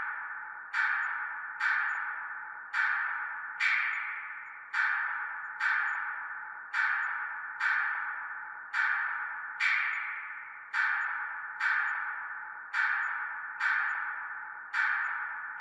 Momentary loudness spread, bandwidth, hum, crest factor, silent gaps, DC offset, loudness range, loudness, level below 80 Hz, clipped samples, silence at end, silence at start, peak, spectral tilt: 11 LU; 10.5 kHz; none; 18 dB; none; under 0.1%; 1 LU; -32 LUFS; -84 dBFS; under 0.1%; 0 s; 0 s; -16 dBFS; 1 dB/octave